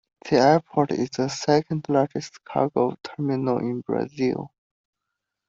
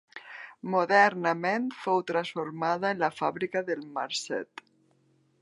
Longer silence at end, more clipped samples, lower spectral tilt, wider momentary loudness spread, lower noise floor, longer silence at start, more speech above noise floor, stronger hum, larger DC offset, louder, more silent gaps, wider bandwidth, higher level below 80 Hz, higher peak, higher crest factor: about the same, 1 s vs 1 s; neither; first, -6 dB/octave vs -4.5 dB/octave; second, 10 LU vs 19 LU; first, -83 dBFS vs -67 dBFS; about the same, 0.25 s vs 0.15 s; first, 60 dB vs 39 dB; neither; neither; first, -24 LUFS vs -28 LUFS; neither; second, 7.8 kHz vs 11.5 kHz; first, -62 dBFS vs -80 dBFS; about the same, -4 dBFS vs -6 dBFS; about the same, 20 dB vs 22 dB